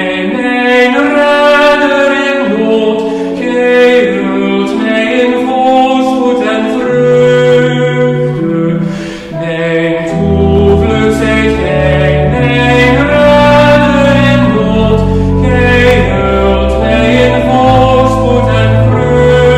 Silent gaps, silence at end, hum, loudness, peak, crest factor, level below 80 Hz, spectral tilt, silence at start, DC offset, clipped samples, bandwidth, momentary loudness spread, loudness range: none; 0 s; none; -8 LUFS; 0 dBFS; 8 dB; -22 dBFS; -7 dB/octave; 0 s; under 0.1%; under 0.1%; 12 kHz; 6 LU; 3 LU